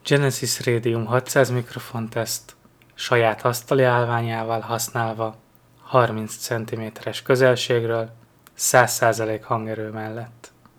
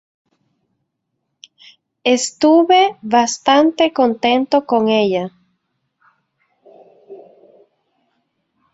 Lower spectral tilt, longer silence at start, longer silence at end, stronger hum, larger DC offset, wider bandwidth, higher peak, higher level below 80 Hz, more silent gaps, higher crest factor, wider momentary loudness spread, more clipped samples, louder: about the same, -4.5 dB/octave vs -3.5 dB/octave; second, 0.05 s vs 2.05 s; second, 0.3 s vs 1.55 s; neither; neither; first, 20 kHz vs 8 kHz; about the same, 0 dBFS vs 0 dBFS; about the same, -64 dBFS vs -62 dBFS; neither; about the same, 22 dB vs 18 dB; first, 13 LU vs 6 LU; neither; second, -22 LUFS vs -15 LUFS